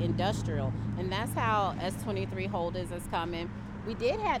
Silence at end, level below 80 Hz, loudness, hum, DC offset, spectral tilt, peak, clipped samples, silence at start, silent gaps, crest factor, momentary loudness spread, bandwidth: 0 s; -46 dBFS; -32 LUFS; none; under 0.1%; -6 dB/octave; -16 dBFS; under 0.1%; 0 s; none; 16 dB; 8 LU; 15.5 kHz